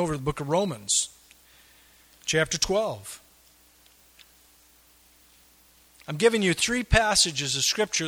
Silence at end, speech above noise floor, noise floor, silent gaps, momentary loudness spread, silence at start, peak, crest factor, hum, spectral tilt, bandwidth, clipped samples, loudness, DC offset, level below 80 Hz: 0 s; 33 dB; -58 dBFS; none; 16 LU; 0 s; -4 dBFS; 24 dB; none; -2.5 dB/octave; over 20 kHz; under 0.1%; -24 LUFS; under 0.1%; -44 dBFS